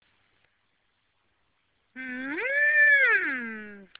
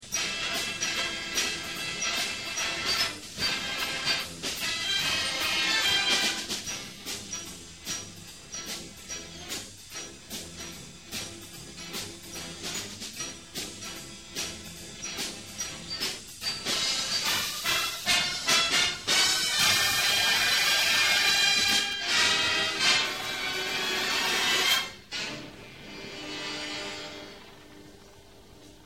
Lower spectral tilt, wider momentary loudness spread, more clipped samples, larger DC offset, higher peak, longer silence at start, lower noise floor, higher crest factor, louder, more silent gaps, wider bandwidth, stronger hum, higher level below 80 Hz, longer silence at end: about the same, 0 dB/octave vs 0 dB/octave; about the same, 20 LU vs 18 LU; neither; second, under 0.1% vs 0.1%; second, -12 dBFS vs -8 dBFS; first, 1.95 s vs 0 s; first, -73 dBFS vs -52 dBFS; about the same, 16 dB vs 20 dB; first, -21 LUFS vs -26 LUFS; neither; second, 4 kHz vs 16 kHz; neither; second, -76 dBFS vs -58 dBFS; first, 0.15 s vs 0 s